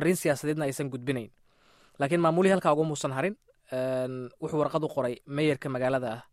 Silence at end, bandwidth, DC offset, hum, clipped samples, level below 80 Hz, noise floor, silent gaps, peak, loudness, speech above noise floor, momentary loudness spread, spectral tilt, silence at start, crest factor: 0.1 s; 15.5 kHz; under 0.1%; none; under 0.1%; -66 dBFS; -61 dBFS; none; -10 dBFS; -29 LUFS; 33 dB; 11 LU; -6 dB/octave; 0 s; 18 dB